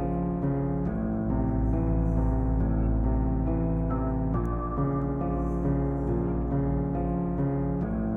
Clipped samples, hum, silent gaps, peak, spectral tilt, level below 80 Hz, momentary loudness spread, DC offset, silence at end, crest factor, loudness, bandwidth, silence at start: under 0.1%; none; none; -14 dBFS; -12 dB/octave; -32 dBFS; 2 LU; under 0.1%; 0 s; 12 dB; -28 LUFS; 2.7 kHz; 0 s